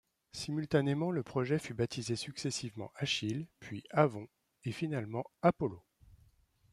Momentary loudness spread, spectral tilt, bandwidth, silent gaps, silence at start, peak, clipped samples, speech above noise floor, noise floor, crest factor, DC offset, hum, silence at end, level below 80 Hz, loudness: 14 LU; -5.5 dB/octave; 13 kHz; none; 0.35 s; -12 dBFS; under 0.1%; 33 dB; -68 dBFS; 24 dB; under 0.1%; none; 0.55 s; -66 dBFS; -35 LUFS